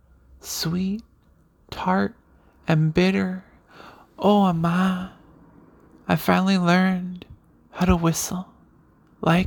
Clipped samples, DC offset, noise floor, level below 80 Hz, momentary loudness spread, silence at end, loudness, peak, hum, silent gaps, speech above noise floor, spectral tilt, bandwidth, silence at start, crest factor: under 0.1%; under 0.1%; -58 dBFS; -44 dBFS; 18 LU; 0 s; -22 LUFS; -6 dBFS; none; none; 37 dB; -6 dB/octave; 19.5 kHz; 0.45 s; 18 dB